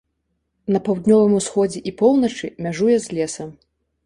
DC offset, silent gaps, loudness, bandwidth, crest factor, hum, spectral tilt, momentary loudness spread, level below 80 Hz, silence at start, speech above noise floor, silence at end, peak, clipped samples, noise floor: under 0.1%; none; -19 LUFS; 11.5 kHz; 16 dB; none; -6 dB/octave; 12 LU; -56 dBFS; 0.7 s; 54 dB; 0.55 s; -2 dBFS; under 0.1%; -72 dBFS